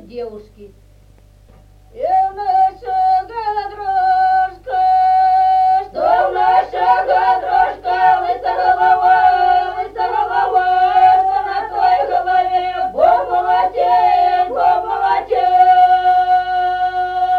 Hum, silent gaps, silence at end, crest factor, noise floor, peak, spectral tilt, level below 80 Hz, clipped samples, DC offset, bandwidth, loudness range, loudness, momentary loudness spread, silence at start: 50 Hz at -45 dBFS; none; 0 s; 12 dB; -46 dBFS; -2 dBFS; -5 dB/octave; -46 dBFS; under 0.1%; under 0.1%; 5.2 kHz; 4 LU; -14 LUFS; 7 LU; 0.1 s